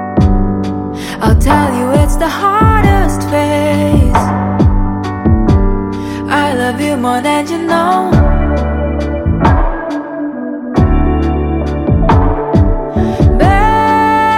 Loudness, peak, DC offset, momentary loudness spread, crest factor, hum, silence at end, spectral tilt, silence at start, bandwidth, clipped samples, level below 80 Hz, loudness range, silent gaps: -12 LUFS; 0 dBFS; under 0.1%; 8 LU; 10 dB; none; 0 s; -7 dB/octave; 0 s; 16.5 kHz; under 0.1%; -18 dBFS; 3 LU; none